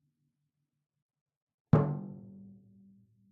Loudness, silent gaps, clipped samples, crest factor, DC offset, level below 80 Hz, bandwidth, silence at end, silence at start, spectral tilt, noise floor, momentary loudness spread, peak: -30 LUFS; none; under 0.1%; 28 dB; under 0.1%; -64 dBFS; 4.1 kHz; 0.9 s; 1.75 s; -10.5 dB/octave; -83 dBFS; 24 LU; -10 dBFS